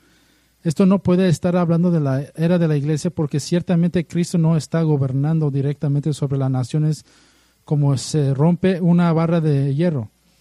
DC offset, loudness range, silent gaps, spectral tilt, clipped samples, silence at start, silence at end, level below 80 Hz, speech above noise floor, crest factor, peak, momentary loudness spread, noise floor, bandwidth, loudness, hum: under 0.1%; 3 LU; none; -7.5 dB/octave; under 0.1%; 0.65 s; 0.35 s; -54 dBFS; 40 dB; 14 dB; -6 dBFS; 6 LU; -57 dBFS; 11.5 kHz; -19 LUFS; none